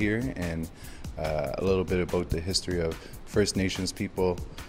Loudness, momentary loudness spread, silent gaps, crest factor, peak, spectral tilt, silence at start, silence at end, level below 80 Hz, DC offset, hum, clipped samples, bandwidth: -29 LUFS; 9 LU; none; 18 dB; -10 dBFS; -5 dB/octave; 0 s; 0 s; -42 dBFS; under 0.1%; none; under 0.1%; 16 kHz